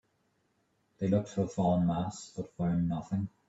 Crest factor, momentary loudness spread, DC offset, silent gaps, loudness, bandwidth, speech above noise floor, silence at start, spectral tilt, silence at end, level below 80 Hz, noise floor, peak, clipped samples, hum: 16 dB; 9 LU; under 0.1%; none; -32 LUFS; 8 kHz; 44 dB; 1 s; -8 dB/octave; 0.2 s; -62 dBFS; -75 dBFS; -16 dBFS; under 0.1%; none